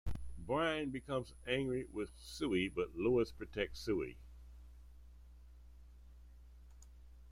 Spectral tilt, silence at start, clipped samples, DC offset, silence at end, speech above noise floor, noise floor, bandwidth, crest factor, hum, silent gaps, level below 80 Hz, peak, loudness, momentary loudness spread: -6 dB/octave; 0.05 s; under 0.1%; under 0.1%; 0 s; 19 dB; -58 dBFS; 15.5 kHz; 18 dB; 60 Hz at -55 dBFS; none; -54 dBFS; -24 dBFS; -39 LUFS; 25 LU